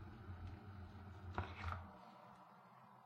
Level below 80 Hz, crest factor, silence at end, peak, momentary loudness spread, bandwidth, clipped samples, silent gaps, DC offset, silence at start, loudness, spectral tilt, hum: -62 dBFS; 26 dB; 0 s; -26 dBFS; 15 LU; 8 kHz; under 0.1%; none; under 0.1%; 0 s; -53 LUFS; -7 dB/octave; none